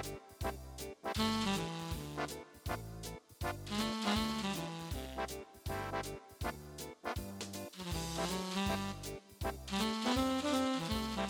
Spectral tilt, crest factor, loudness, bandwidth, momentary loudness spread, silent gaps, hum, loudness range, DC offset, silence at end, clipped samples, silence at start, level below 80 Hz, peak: -4.5 dB/octave; 18 dB; -39 LUFS; over 20 kHz; 12 LU; none; none; 6 LU; under 0.1%; 0 s; under 0.1%; 0 s; -52 dBFS; -20 dBFS